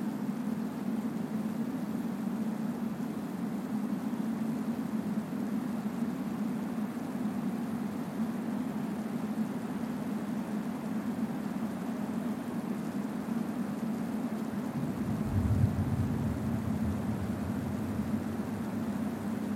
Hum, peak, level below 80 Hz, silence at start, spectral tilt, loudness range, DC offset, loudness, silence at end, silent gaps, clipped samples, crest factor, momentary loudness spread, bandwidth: none; -16 dBFS; -52 dBFS; 0 s; -7.5 dB/octave; 3 LU; under 0.1%; -34 LUFS; 0 s; none; under 0.1%; 18 dB; 3 LU; 16 kHz